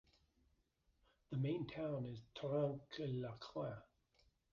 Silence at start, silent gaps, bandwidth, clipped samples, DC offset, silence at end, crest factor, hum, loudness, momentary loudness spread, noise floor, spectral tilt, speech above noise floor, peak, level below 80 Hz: 1.3 s; none; 7 kHz; under 0.1%; under 0.1%; 0.7 s; 18 dB; none; -45 LUFS; 8 LU; -80 dBFS; -7 dB/octave; 37 dB; -28 dBFS; -74 dBFS